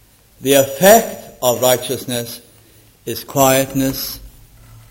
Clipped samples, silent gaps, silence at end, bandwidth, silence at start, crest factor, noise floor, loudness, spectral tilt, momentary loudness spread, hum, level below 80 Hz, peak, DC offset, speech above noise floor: under 0.1%; none; 0.6 s; 16.5 kHz; 0.4 s; 18 dB; -48 dBFS; -15 LUFS; -3.5 dB/octave; 18 LU; none; -46 dBFS; 0 dBFS; under 0.1%; 33 dB